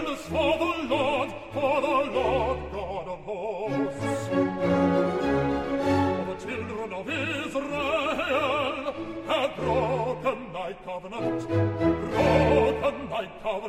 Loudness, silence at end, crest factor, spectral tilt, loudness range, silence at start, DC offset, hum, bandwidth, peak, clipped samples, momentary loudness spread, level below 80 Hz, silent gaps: -27 LUFS; 0 s; 18 dB; -6.5 dB/octave; 2 LU; 0 s; under 0.1%; none; 15 kHz; -8 dBFS; under 0.1%; 10 LU; -46 dBFS; none